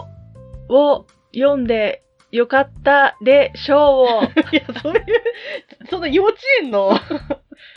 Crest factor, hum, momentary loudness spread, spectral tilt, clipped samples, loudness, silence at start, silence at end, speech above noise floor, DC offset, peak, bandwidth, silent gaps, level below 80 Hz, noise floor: 16 dB; none; 15 LU; -6.5 dB/octave; under 0.1%; -16 LUFS; 0 s; 0.4 s; 24 dB; under 0.1%; -2 dBFS; 6.2 kHz; none; -46 dBFS; -39 dBFS